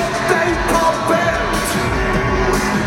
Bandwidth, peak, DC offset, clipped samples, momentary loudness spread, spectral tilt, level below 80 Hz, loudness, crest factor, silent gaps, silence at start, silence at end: 16.5 kHz; -2 dBFS; under 0.1%; under 0.1%; 2 LU; -4.5 dB/octave; -28 dBFS; -16 LUFS; 14 dB; none; 0 s; 0 s